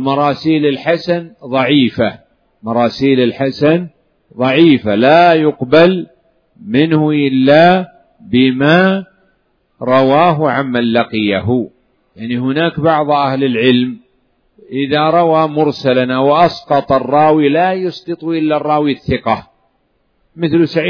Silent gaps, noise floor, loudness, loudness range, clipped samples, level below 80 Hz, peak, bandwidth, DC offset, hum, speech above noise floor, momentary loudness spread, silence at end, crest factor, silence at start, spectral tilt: none; -60 dBFS; -12 LUFS; 4 LU; under 0.1%; -50 dBFS; 0 dBFS; 5.4 kHz; under 0.1%; none; 49 dB; 10 LU; 0 s; 12 dB; 0 s; -8 dB/octave